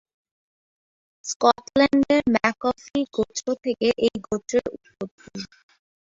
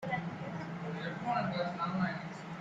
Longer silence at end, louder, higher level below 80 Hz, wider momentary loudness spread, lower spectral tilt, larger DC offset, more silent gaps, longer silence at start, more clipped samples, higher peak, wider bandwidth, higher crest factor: first, 0.7 s vs 0 s; first, -22 LUFS vs -37 LUFS; first, -56 dBFS vs -70 dBFS; first, 18 LU vs 7 LU; second, -4 dB/octave vs -7 dB/octave; neither; first, 1.36-1.40 s, 5.11-5.18 s vs none; first, 1.25 s vs 0 s; neither; first, -2 dBFS vs -20 dBFS; about the same, 7.8 kHz vs 7.8 kHz; first, 22 dB vs 16 dB